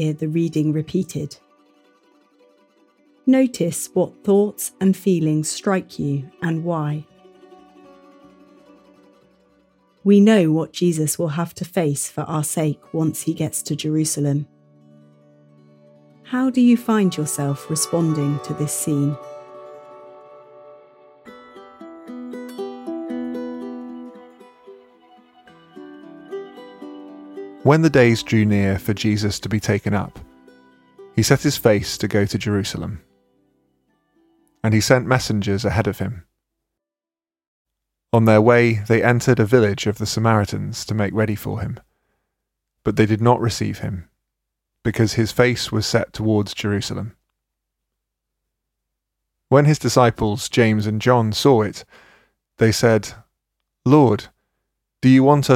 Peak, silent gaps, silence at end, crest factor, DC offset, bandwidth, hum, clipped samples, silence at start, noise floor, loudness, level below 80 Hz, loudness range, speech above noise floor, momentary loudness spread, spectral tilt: 0 dBFS; 37.47-37.65 s; 0 s; 20 dB; under 0.1%; 16.5 kHz; none; under 0.1%; 0 s; under -90 dBFS; -19 LUFS; -52 dBFS; 14 LU; over 72 dB; 18 LU; -5.5 dB/octave